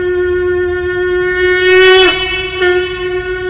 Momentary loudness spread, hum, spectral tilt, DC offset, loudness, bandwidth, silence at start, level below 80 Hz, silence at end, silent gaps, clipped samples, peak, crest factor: 10 LU; none; -8 dB/octave; under 0.1%; -11 LUFS; 4 kHz; 0 s; -32 dBFS; 0 s; none; under 0.1%; 0 dBFS; 12 dB